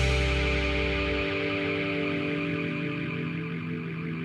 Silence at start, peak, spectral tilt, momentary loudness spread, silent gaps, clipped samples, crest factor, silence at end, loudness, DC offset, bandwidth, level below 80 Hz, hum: 0 s; -14 dBFS; -6 dB/octave; 7 LU; none; under 0.1%; 14 dB; 0 s; -29 LUFS; under 0.1%; 11 kHz; -36 dBFS; none